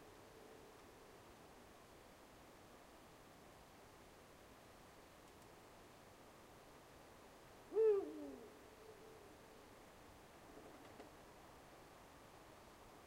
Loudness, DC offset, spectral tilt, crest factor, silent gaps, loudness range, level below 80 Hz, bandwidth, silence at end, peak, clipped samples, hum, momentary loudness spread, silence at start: -46 LUFS; under 0.1%; -5 dB/octave; 24 dB; none; 17 LU; -74 dBFS; 16 kHz; 0 s; -28 dBFS; under 0.1%; none; 11 LU; 0 s